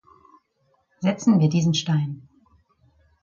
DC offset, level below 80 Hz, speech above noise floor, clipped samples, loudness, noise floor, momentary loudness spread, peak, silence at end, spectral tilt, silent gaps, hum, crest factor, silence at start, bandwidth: under 0.1%; -64 dBFS; 47 dB; under 0.1%; -22 LUFS; -68 dBFS; 11 LU; -8 dBFS; 1.05 s; -6 dB/octave; none; none; 16 dB; 1 s; 7.4 kHz